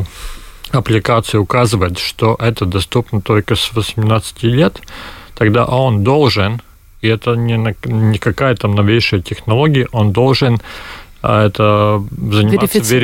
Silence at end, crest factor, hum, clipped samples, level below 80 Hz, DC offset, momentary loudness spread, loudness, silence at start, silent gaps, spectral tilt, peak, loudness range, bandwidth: 0 s; 14 dB; none; under 0.1%; -36 dBFS; under 0.1%; 8 LU; -14 LUFS; 0 s; none; -6 dB/octave; 0 dBFS; 2 LU; 17 kHz